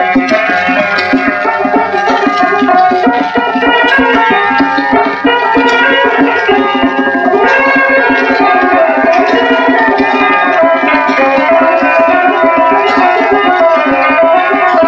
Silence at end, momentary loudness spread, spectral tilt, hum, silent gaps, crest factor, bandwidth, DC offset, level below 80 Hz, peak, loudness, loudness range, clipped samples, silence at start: 0 s; 3 LU; -5 dB/octave; none; none; 8 dB; 7.4 kHz; under 0.1%; -46 dBFS; 0 dBFS; -8 LUFS; 1 LU; under 0.1%; 0 s